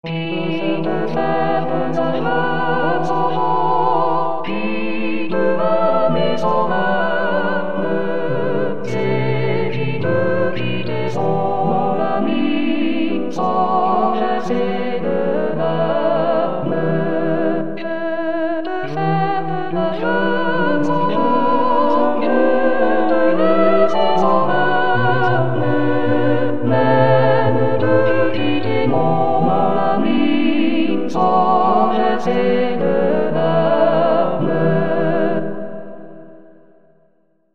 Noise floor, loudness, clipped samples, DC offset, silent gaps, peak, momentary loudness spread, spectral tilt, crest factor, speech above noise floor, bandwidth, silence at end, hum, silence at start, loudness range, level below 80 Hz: -61 dBFS; -17 LUFS; under 0.1%; 8%; none; 0 dBFS; 6 LU; -8 dB/octave; 16 dB; 42 dB; 7.2 kHz; 0 s; none; 0 s; 4 LU; -58 dBFS